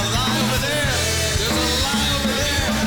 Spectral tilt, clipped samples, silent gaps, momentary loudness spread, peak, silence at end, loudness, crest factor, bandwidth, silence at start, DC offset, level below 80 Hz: -3 dB/octave; under 0.1%; none; 1 LU; -10 dBFS; 0 s; -19 LUFS; 10 dB; over 20 kHz; 0 s; 0.3%; -30 dBFS